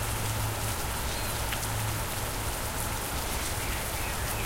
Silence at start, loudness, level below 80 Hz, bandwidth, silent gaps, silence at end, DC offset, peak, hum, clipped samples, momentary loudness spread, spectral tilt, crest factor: 0 s; -31 LUFS; -38 dBFS; 16 kHz; none; 0 s; under 0.1%; -14 dBFS; none; under 0.1%; 1 LU; -3 dB/octave; 16 dB